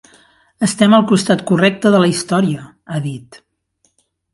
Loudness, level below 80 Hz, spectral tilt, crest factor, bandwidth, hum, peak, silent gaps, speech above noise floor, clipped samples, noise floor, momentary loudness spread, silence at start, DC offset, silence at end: -14 LUFS; -56 dBFS; -5.5 dB/octave; 16 dB; 11.5 kHz; none; 0 dBFS; none; 50 dB; under 0.1%; -63 dBFS; 14 LU; 0.6 s; under 0.1%; 1 s